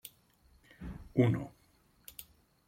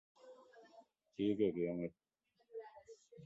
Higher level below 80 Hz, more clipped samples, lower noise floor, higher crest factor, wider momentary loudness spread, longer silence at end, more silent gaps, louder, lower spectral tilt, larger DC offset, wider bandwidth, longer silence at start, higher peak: first, -58 dBFS vs -76 dBFS; neither; about the same, -68 dBFS vs -69 dBFS; about the same, 22 dB vs 20 dB; second, 22 LU vs 26 LU; first, 0.45 s vs 0 s; neither; first, -32 LUFS vs -39 LUFS; about the same, -7.5 dB/octave vs -7 dB/octave; neither; first, 16.5 kHz vs 7.8 kHz; second, 0.05 s vs 0.25 s; first, -14 dBFS vs -24 dBFS